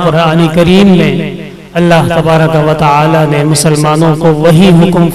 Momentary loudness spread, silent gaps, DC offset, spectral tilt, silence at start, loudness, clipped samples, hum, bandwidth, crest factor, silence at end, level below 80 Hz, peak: 7 LU; none; under 0.1%; -6 dB/octave; 0 s; -7 LUFS; 0.8%; none; 14 kHz; 6 dB; 0 s; -32 dBFS; 0 dBFS